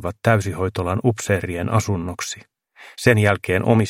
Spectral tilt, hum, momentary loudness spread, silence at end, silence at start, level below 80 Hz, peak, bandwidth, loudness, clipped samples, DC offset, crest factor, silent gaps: -6 dB/octave; none; 12 LU; 0 s; 0 s; -48 dBFS; 0 dBFS; 16 kHz; -20 LUFS; under 0.1%; under 0.1%; 20 dB; none